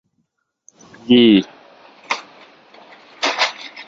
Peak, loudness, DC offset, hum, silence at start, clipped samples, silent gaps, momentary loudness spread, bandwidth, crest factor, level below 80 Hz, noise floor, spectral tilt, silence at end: -2 dBFS; -16 LUFS; under 0.1%; none; 1.05 s; under 0.1%; none; 17 LU; 7.6 kHz; 18 dB; -60 dBFS; -70 dBFS; -4.5 dB/octave; 0.05 s